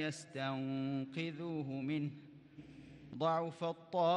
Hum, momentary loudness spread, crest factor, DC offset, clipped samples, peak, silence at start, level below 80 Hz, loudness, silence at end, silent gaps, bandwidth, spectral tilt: none; 20 LU; 16 dB; under 0.1%; under 0.1%; -22 dBFS; 0 s; -78 dBFS; -40 LUFS; 0 s; none; 10.5 kHz; -6.5 dB/octave